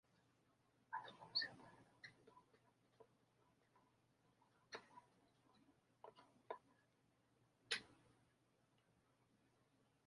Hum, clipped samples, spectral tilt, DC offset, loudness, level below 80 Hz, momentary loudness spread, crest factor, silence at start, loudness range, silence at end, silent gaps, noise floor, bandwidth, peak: none; under 0.1%; -1.5 dB/octave; under 0.1%; -50 LUFS; under -90 dBFS; 22 LU; 30 dB; 0.9 s; 14 LU; 2 s; none; -81 dBFS; 11 kHz; -28 dBFS